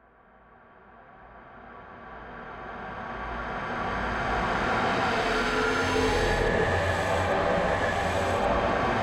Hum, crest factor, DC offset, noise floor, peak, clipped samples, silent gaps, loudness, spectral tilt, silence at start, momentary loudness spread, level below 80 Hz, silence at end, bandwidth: none; 16 dB; under 0.1%; -56 dBFS; -12 dBFS; under 0.1%; none; -26 LUFS; -5 dB/octave; 0.9 s; 17 LU; -40 dBFS; 0 s; 16 kHz